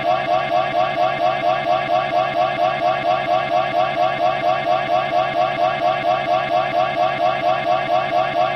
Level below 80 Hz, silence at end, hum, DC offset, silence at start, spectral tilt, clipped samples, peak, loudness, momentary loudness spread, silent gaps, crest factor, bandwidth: -54 dBFS; 0 s; none; under 0.1%; 0 s; -5.5 dB/octave; under 0.1%; -6 dBFS; -19 LUFS; 1 LU; none; 12 dB; 8.4 kHz